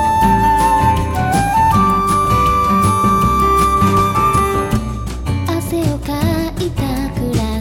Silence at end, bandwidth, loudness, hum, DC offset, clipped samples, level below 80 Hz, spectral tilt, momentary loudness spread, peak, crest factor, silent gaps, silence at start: 0 s; 17 kHz; -14 LUFS; none; under 0.1%; under 0.1%; -26 dBFS; -6 dB/octave; 7 LU; -2 dBFS; 14 dB; none; 0 s